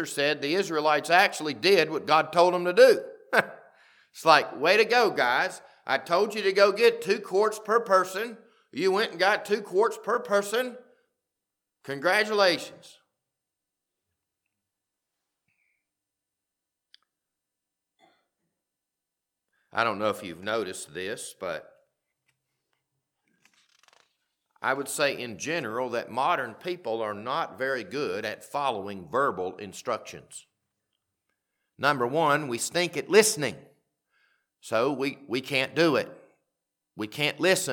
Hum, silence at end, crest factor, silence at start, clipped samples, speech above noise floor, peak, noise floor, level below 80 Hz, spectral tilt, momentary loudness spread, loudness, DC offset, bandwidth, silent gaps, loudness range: none; 0 s; 24 dB; 0 s; under 0.1%; 61 dB; -4 dBFS; -87 dBFS; -80 dBFS; -3 dB/octave; 14 LU; -25 LUFS; under 0.1%; 19 kHz; none; 12 LU